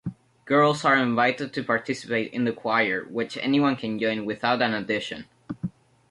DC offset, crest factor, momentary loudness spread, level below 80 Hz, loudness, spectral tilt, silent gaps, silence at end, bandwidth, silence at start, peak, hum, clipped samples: under 0.1%; 18 dB; 14 LU; -64 dBFS; -24 LUFS; -5.5 dB/octave; none; 0.4 s; 11.5 kHz; 0.05 s; -8 dBFS; none; under 0.1%